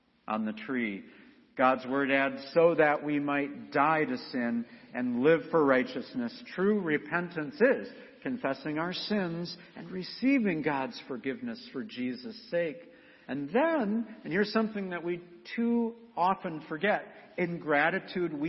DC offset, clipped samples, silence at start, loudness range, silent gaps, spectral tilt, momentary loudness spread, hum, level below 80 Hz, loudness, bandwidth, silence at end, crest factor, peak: under 0.1%; under 0.1%; 0.25 s; 5 LU; none; -8 dB/octave; 13 LU; none; -74 dBFS; -30 LUFS; 6 kHz; 0 s; 20 dB; -10 dBFS